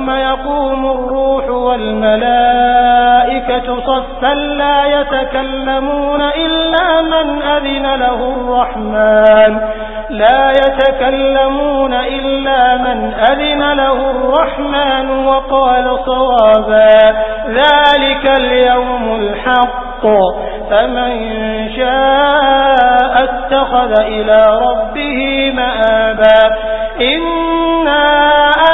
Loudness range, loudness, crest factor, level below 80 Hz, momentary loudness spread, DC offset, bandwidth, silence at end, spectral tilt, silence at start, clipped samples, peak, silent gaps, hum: 4 LU; -11 LUFS; 10 dB; -30 dBFS; 8 LU; under 0.1%; 4 kHz; 0 s; -6.5 dB/octave; 0 s; under 0.1%; 0 dBFS; none; none